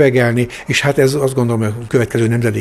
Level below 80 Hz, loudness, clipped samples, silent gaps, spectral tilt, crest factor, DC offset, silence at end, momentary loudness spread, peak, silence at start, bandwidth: -44 dBFS; -15 LUFS; under 0.1%; none; -6 dB/octave; 14 dB; under 0.1%; 0 s; 5 LU; 0 dBFS; 0 s; 13.5 kHz